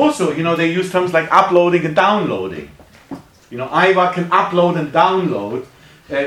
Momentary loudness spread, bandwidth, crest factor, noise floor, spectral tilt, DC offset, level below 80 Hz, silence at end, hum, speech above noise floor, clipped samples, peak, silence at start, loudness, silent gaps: 18 LU; 13.5 kHz; 16 dB; -35 dBFS; -6 dB/octave; under 0.1%; -56 dBFS; 0 s; none; 20 dB; under 0.1%; 0 dBFS; 0 s; -15 LUFS; none